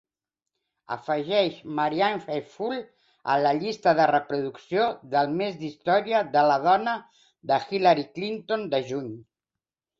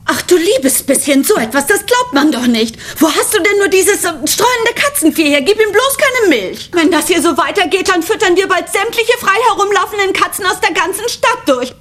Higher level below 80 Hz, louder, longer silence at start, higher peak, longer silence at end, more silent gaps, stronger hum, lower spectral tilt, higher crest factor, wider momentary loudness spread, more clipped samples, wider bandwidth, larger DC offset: second, -70 dBFS vs -46 dBFS; second, -25 LUFS vs -11 LUFS; first, 0.9 s vs 0.05 s; second, -8 dBFS vs 0 dBFS; first, 0.8 s vs 0.1 s; neither; neither; first, -6 dB/octave vs -2 dB/octave; first, 18 dB vs 12 dB; first, 12 LU vs 4 LU; neither; second, 7.4 kHz vs 16.5 kHz; neither